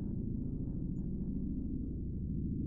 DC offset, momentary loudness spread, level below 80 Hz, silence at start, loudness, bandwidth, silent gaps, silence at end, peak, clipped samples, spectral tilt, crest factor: under 0.1%; 2 LU; -42 dBFS; 0 s; -40 LUFS; 1.4 kHz; none; 0 s; -26 dBFS; under 0.1%; -17 dB/octave; 12 dB